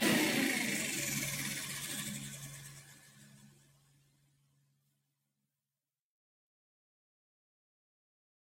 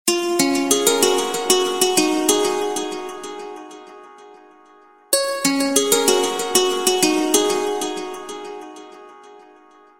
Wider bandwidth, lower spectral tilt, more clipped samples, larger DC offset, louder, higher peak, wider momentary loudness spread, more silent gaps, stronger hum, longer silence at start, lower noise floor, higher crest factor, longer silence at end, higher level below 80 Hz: about the same, 16 kHz vs 17 kHz; about the same, -2.5 dB/octave vs -1.5 dB/octave; neither; neither; second, -35 LUFS vs -18 LUFS; second, -18 dBFS vs 0 dBFS; first, 20 LU vs 17 LU; neither; neither; about the same, 0 s vs 0.05 s; first, under -90 dBFS vs -50 dBFS; about the same, 22 dB vs 20 dB; first, 4.95 s vs 0.55 s; second, -72 dBFS vs -62 dBFS